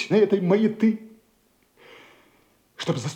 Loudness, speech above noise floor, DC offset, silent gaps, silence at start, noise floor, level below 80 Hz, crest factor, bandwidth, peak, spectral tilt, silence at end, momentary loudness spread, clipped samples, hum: -23 LUFS; 43 dB; under 0.1%; none; 0 s; -64 dBFS; -72 dBFS; 16 dB; 9.4 kHz; -8 dBFS; -6.5 dB/octave; 0 s; 12 LU; under 0.1%; none